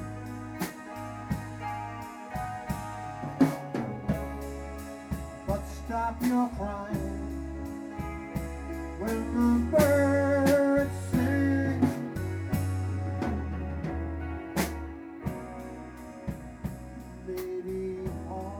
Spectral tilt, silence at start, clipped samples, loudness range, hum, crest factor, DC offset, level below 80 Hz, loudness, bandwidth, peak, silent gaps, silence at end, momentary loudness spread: -7 dB/octave; 0 s; under 0.1%; 11 LU; none; 20 dB; under 0.1%; -42 dBFS; -31 LUFS; over 20 kHz; -10 dBFS; none; 0 s; 15 LU